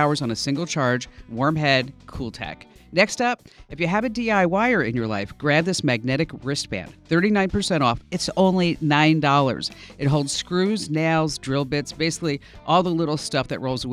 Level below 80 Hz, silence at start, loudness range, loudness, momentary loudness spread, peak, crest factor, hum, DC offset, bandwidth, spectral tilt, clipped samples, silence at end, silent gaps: -48 dBFS; 0 s; 3 LU; -22 LUFS; 12 LU; -4 dBFS; 18 dB; none; under 0.1%; 14 kHz; -5 dB/octave; under 0.1%; 0 s; none